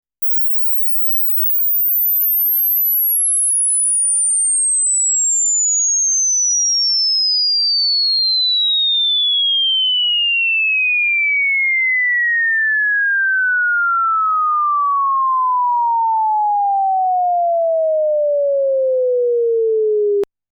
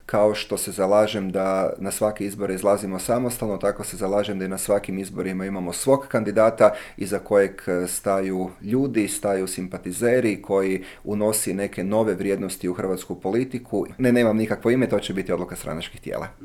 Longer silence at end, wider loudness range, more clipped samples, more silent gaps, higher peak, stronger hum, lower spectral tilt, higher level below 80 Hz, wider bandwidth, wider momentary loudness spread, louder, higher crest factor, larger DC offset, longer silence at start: first, 0.25 s vs 0 s; about the same, 4 LU vs 3 LU; neither; neither; second, -12 dBFS vs -2 dBFS; first, 50 Hz at -100 dBFS vs none; second, 4.5 dB/octave vs -5 dB/octave; second, -80 dBFS vs -50 dBFS; first, over 20 kHz vs 17 kHz; second, 4 LU vs 9 LU; first, -13 LUFS vs -23 LUFS; second, 4 dB vs 22 dB; neither; about the same, 0.2 s vs 0.1 s